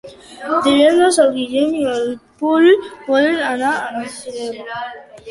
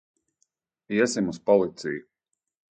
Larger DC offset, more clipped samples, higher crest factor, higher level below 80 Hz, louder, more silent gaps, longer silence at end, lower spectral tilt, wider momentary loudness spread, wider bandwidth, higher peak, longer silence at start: neither; neither; second, 14 dB vs 20 dB; first, -58 dBFS vs -66 dBFS; first, -16 LUFS vs -25 LUFS; neither; second, 0 s vs 0.75 s; second, -3 dB/octave vs -5 dB/octave; first, 16 LU vs 11 LU; first, 11.5 kHz vs 9.4 kHz; first, -2 dBFS vs -6 dBFS; second, 0.05 s vs 0.9 s